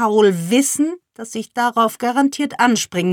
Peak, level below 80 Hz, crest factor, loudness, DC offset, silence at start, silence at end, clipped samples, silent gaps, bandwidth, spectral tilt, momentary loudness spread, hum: -2 dBFS; -68 dBFS; 16 dB; -17 LUFS; under 0.1%; 0 s; 0 s; under 0.1%; none; 19 kHz; -4 dB/octave; 12 LU; none